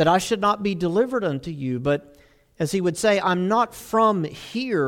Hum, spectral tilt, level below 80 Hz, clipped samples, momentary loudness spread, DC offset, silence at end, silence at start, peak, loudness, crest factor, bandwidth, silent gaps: none; -5.5 dB/octave; -54 dBFS; under 0.1%; 9 LU; under 0.1%; 0 s; 0 s; -6 dBFS; -23 LUFS; 16 dB; 17 kHz; none